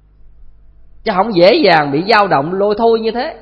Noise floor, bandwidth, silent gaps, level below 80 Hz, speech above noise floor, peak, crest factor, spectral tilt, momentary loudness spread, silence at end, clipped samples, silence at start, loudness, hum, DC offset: -40 dBFS; 8.6 kHz; none; -44 dBFS; 28 dB; 0 dBFS; 14 dB; -7 dB/octave; 9 LU; 0.05 s; under 0.1%; 0.25 s; -12 LUFS; 50 Hz at -40 dBFS; under 0.1%